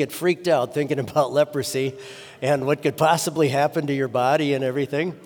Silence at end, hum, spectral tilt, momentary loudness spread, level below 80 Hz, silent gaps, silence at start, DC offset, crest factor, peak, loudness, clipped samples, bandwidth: 0 s; none; -5 dB/octave; 6 LU; -68 dBFS; none; 0 s; under 0.1%; 16 dB; -6 dBFS; -22 LUFS; under 0.1%; over 20 kHz